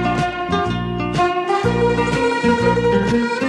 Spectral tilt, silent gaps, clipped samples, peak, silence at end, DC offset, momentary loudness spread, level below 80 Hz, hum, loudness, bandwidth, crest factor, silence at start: -6 dB/octave; none; under 0.1%; -4 dBFS; 0 s; under 0.1%; 5 LU; -36 dBFS; none; -18 LUFS; 11 kHz; 12 dB; 0 s